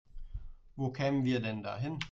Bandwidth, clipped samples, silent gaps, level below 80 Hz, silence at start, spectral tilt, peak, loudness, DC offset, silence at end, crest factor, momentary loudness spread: 7.6 kHz; under 0.1%; none; -50 dBFS; 0.15 s; -7 dB/octave; -20 dBFS; -34 LUFS; under 0.1%; 0 s; 16 dB; 19 LU